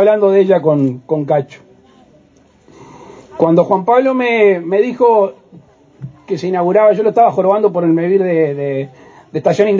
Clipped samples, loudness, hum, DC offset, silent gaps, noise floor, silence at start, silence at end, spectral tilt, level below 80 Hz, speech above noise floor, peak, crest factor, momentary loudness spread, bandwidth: under 0.1%; -13 LUFS; none; under 0.1%; none; -49 dBFS; 0 s; 0 s; -8 dB/octave; -62 dBFS; 37 dB; 0 dBFS; 14 dB; 12 LU; 7.4 kHz